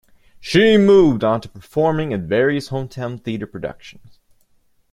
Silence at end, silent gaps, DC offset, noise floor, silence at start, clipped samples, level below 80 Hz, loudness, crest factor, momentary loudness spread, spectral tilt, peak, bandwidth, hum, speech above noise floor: 1 s; none; under 0.1%; -58 dBFS; 0.4 s; under 0.1%; -50 dBFS; -17 LUFS; 16 dB; 16 LU; -6.5 dB/octave; -2 dBFS; 12 kHz; none; 41 dB